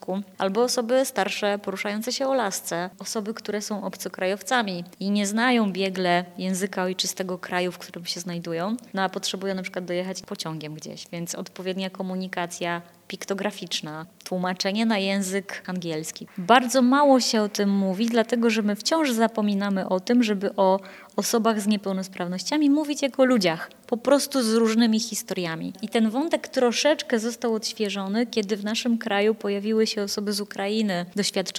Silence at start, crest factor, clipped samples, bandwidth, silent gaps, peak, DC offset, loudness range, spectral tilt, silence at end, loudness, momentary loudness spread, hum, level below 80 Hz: 0.1 s; 22 dB; under 0.1%; 16.5 kHz; none; -2 dBFS; under 0.1%; 8 LU; -4 dB/octave; 0 s; -25 LUFS; 11 LU; none; -76 dBFS